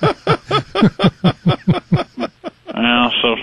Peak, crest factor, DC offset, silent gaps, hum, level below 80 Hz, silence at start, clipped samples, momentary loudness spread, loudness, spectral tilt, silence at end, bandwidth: 0 dBFS; 16 dB; under 0.1%; none; none; -42 dBFS; 0 s; under 0.1%; 13 LU; -16 LUFS; -7 dB/octave; 0 s; 10 kHz